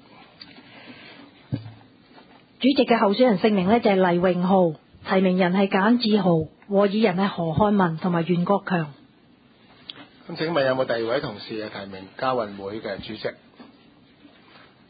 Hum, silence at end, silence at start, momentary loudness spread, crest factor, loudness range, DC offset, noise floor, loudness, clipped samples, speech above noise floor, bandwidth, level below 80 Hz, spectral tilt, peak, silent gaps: none; 1.25 s; 0.4 s; 17 LU; 18 dB; 8 LU; under 0.1%; -55 dBFS; -22 LUFS; under 0.1%; 34 dB; 5 kHz; -56 dBFS; -11.5 dB/octave; -6 dBFS; none